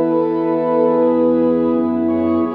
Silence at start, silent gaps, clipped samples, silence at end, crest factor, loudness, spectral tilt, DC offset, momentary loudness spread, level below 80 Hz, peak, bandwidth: 0 s; none; under 0.1%; 0 s; 10 dB; -16 LUFS; -10.5 dB/octave; under 0.1%; 3 LU; -58 dBFS; -4 dBFS; 4.4 kHz